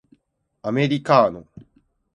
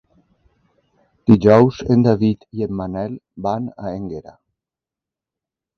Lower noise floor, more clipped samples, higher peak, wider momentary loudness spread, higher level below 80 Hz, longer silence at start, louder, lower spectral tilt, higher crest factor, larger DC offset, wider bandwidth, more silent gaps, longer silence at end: second, -70 dBFS vs -88 dBFS; neither; about the same, 0 dBFS vs 0 dBFS; about the same, 16 LU vs 17 LU; second, -60 dBFS vs -48 dBFS; second, 0.65 s vs 1.25 s; about the same, -19 LUFS vs -18 LUFS; second, -7 dB/octave vs -9 dB/octave; about the same, 22 dB vs 20 dB; neither; first, 10.5 kHz vs 6.6 kHz; neither; second, 0.55 s vs 1.55 s